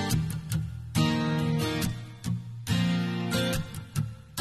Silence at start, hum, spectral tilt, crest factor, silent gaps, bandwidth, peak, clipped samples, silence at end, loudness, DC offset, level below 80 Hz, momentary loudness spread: 0 s; none; -5.5 dB/octave; 18 dB; none; 14 kHz; -12 dBFS; under 0.1%; 0 s; -30 LUFS; under 0.1%; -46 dBFS; 8 LU